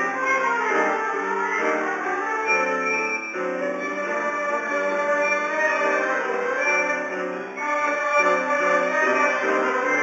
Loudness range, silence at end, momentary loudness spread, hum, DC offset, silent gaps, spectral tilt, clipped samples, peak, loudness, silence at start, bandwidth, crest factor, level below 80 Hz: 2 LU; 0 s; 6 LU; none; under 0.1%; none; -3.5 dB/octave; under 0.1%; -8 dBFS; -22 LUFS; 0 s; 8 kHz; 16 dB; -86 dBFS